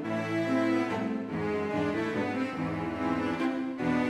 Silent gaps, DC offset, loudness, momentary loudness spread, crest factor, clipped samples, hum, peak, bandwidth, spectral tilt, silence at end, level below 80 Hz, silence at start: none; under 0.1%; -30 LUFS; 5 LU; 14 dB; under 0.1%; none; -16 dBFS; 11.5 kHz; -7 dB/octave; 0 s; -60 dBFS; 0 s